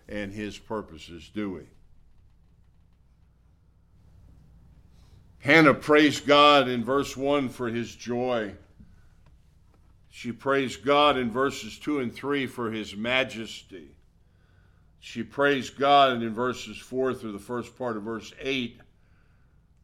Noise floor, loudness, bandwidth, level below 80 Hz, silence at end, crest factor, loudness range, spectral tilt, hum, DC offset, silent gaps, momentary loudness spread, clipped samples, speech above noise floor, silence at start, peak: -60 dBFS; -25 LUFS; 14.5 kHz; -56 dBFS; 1.1 s; 24 dB; 13 LU; -4.5 dB/octave; none; under 0.1%; none; 19 LU; under 0.1%; 34 dB; 0.1 s; -4 dBFS